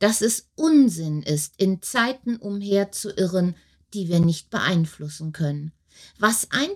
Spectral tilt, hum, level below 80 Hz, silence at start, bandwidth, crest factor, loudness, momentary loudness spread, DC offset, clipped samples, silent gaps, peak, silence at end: -4.5 dB/octave; none; -58 dBFS; 0 s; 16.5 kHz; 18 dB; -23 LUFS; 12 LU; under 0.1%; under 0.1%; none; -4 dBFS; 0 s